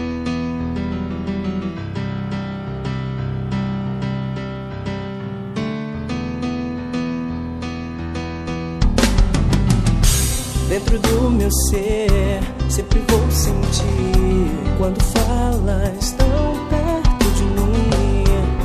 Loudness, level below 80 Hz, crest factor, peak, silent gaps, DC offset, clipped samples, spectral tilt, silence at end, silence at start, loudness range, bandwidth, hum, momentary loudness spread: -20 LUFS; -22 dBFS; 18 dB; 0 dBFS; none; under 0.1%; under 0.1%; -5.5 dB/octave; 0 s; 0 s; 8 LU; 14 kHz; none; 10 LU